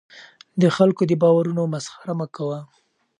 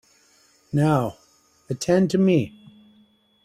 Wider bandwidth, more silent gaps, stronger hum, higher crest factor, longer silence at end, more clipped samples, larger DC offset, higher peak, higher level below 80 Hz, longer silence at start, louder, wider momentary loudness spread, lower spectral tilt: second, 10.5 kHz vs 14 kHz; neither; neither; about the same, 18 dB vs 18 dB; second, 0.55 s vs 0.95 s; neither; neither; about the same, -4 dBFS vs -6 dBFS; second, -66 dBFS vs -58 dBFS; second, 0.15 s vs 0.75 s; about the same, -21 LUFS vs -22 LUFS; about the same, 13 LU vs 13 LU; about the same, -7 dB/octave vs -7 dB/octave